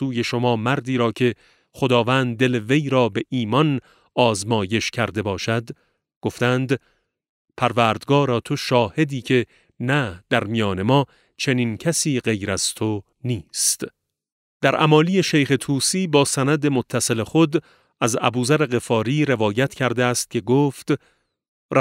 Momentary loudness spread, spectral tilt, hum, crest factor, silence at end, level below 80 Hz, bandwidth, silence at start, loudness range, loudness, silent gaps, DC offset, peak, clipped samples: 8 LU; -4.5 dB/octave; none; 20 dB; 0 s; -58 dBFS; 16 kHz; 0 s; 4 LU; -21 LUFS; 6.16-6.21 s, 7.29-7.45 s, 14.32-14.60 s, 21.48-21.69 s; under 0.1%; -2 dBFS; under 0.1%